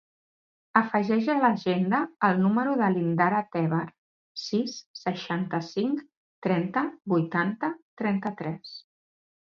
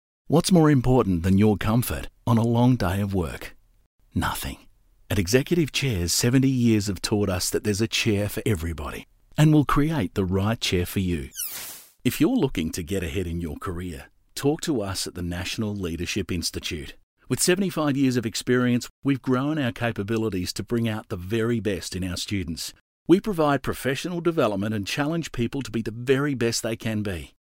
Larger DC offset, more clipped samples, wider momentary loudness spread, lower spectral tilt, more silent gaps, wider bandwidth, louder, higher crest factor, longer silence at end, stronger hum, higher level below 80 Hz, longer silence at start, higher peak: neither; neither; about the same, 11 LU vs 12 LU; first, -7 dB/octave vs -5.5 dB/octave; first, 3.98-4.35 s, 4.86-4.94 s, 6.17-6.42 s, 7.82-7.97 s vs 3.86-3.99 s, 17.03-17.16 s, 18.90-19.02 s, 22.81-23.06 s; second, 7 kHz vs 16 kHz; second, -27 LUFS vs -24 LUFS; about the same, 22 dB vs 20 dB; first, 0.75 s vs 0.25 s; neither; second, -74 dBFS vs -44 dBFS; first, 0.75 s vs 0.3 s; about the same, -4 dBFS vs -6 dBFS